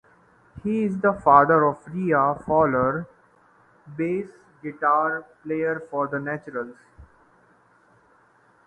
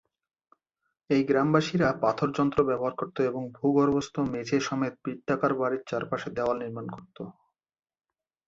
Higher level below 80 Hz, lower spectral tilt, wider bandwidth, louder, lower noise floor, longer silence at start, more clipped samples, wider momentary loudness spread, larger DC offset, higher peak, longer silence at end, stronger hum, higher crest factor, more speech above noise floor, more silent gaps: about the same, -56 dBFS vs -60 dBFS; first, -9.5 dB/octave vs -6.5 dB/octave; first, 9.2 kHz vs 7.8 kHz; first, -23 LUFS vs -27 LUFS; second, -59 dBFS vs under -90 dBFS; second, 0.55 s vs 1.1 s; neither; first, 18 LU vs 13 LU; neither; first, -2 dBFS vs -8 dBFS; first, 1.6 s vs 1.15 s; neither; about the same, 24 dB vs 20 dB; second, 37 dB vs over 63 dB; neither